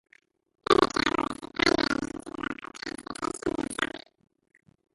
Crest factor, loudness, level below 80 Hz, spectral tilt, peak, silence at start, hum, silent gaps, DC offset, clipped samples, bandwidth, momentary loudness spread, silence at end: 24 dB; -28 LUFS; -54 dBFS; -3.5 dB/octave; -6 dBFS; 0.7 s; none; none; under 0.1%; under 0.1%; 11.5 kHz; 14 LU; 0.95 s